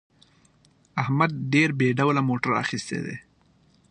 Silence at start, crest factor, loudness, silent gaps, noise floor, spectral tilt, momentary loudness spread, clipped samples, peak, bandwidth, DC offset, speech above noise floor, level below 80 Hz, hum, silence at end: 0.95 s; 20 dB; -24 LUFS; none; -61 dBFS; -6 dB/octave; 11 LU; under 0.1%; -6 dBFS; 9.6 kHz; under 0.1%; 37 dB; -64 dBFS; none; 0.7 s